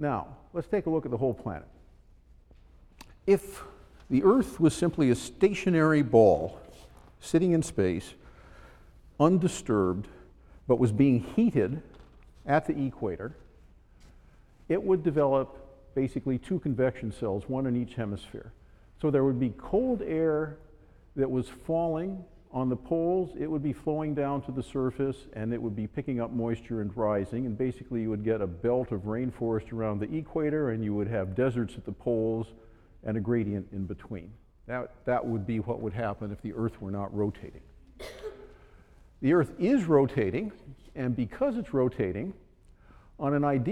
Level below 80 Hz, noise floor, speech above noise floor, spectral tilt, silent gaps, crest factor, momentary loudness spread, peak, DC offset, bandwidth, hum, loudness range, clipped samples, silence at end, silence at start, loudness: -52 dBFS; -57 dBFS; 29 dB; -7.5 dB/octave; none; 22 dB; 14 LU; -8 dBFS; under 0.1%; 14 kHz; none; 7 LU; under 0.1%; 0 s; 0 s; -29 LUFS